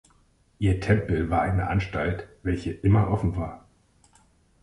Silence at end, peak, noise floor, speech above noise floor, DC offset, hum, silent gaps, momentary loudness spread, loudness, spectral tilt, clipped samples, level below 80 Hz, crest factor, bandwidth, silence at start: 1.05 s; -6 dBFS; -62 dBFS; 38 dB; under 0.1%; none; none; 8 LU; -26 LUFS; -8.5 dB/octave; under 0.1%; -38 dBFS; 20 dB; 11 kHz; 0.6 s